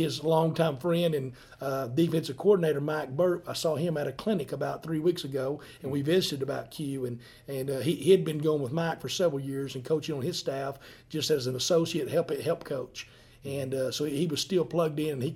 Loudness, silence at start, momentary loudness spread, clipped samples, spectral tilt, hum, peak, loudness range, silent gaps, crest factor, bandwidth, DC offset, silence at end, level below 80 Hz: -29 LUFS; 0 s; 11 LU; under 0.1%; -5.5 dB/octave; none; -8 dBFS; 3 LU; none; 20 dB; 16.5 kHz; under 0.1%; 0 s; -64 dBFS